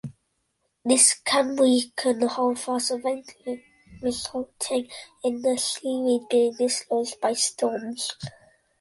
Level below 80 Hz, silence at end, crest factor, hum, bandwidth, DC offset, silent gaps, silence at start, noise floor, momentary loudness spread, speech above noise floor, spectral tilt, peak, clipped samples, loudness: -64 dBFS; 0.5 s; 20 dB; none; 11.5 kHz; under 0.1%; none; 0.05 s; -74 dBFS; 14 LU; 50 dB; -2 dB/octave; -4 dBFS; under 0.1%; -24 LUFS